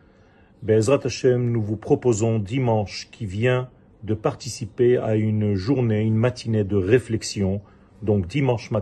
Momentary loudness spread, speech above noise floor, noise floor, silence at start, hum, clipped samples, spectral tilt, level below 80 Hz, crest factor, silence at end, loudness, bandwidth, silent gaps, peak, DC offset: 11 LU; 32 dB; -53 dBFS; 0.6 s; none; under 0.1%; -6.5 dB/octave; -52 dBFS; 18 dB; 0 s; -22 LUFS; 9.8 kHz; none; -2 dBFS; under 0.1%